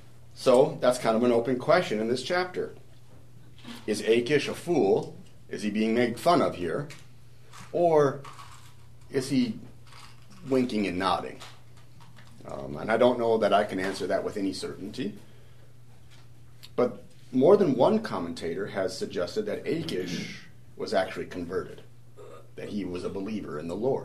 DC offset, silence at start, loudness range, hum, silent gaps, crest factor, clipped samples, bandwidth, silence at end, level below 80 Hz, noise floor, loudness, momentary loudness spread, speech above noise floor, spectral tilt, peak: 0.5%; 0.35 s; 7 LU; none; none; 22 dB; under 0.1%; 13.5 kHz; 0 s; -62 dBFS; -53 dBFS; -27 LUFS; 19 LU; 27 dB; -5.5 dB/octave; -6 dBFS